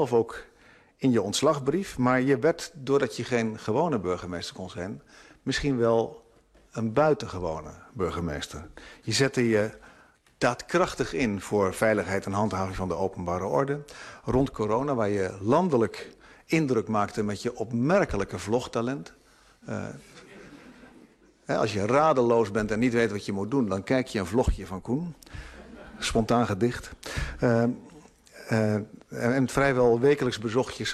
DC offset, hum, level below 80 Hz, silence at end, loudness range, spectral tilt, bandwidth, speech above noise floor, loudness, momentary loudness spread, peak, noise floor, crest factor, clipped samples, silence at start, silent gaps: under 0.1%; none; -46 dBFS; 0 s; 4 LU; -5.5 dB/octave; 13 kHz; 33 dB; -27 LUFS; 15 LU; -8 dBFS; -59 dBFS; 18 dB; under 0.1%; 0 s; none